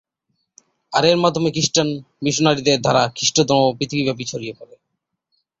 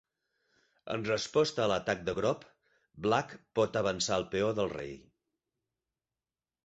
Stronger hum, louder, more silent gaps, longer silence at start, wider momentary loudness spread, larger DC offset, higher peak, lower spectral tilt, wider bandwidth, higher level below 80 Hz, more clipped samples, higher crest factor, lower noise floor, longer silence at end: neither; first, -18 LUFS vs -32 LUFS; neither; about the same, 0.9 s vs 0.85 s; about the same, 9 LU vs 10 LU; neither; first, -2 dBFS vs -12 dBFS; about the same, -4 dB/octave vs -4.5 dB/octave; about the same, 8 kHz vs 8.2 kHz; first, -56 dBFS vs -62 dBFS; neither; about the same, 18 dB vs 22 dB; second, -77 dBFS vs under -90 dBFS; second, 0.95 s vs 1.65 s